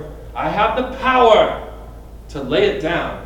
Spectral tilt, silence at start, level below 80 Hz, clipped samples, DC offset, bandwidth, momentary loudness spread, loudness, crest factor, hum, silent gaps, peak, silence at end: -5.5 dB/octave; 0 s; -36 dBFS; under 0.1%; under 0.1%; 16.5 kHz; 20 LU; -16 LUFS; 18 dB; none; none; 0 dBFS; 0 s